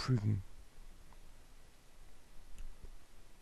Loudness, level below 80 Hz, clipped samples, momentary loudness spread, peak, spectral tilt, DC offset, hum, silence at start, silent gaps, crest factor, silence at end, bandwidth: -37 LUFS; -52 dBFS; under 0.1%; 27 LU; -24 dBFS; -7 dB/octave; under 0.1%; none; 0 s; none; 18 dB; 0 s; 12.5 kHz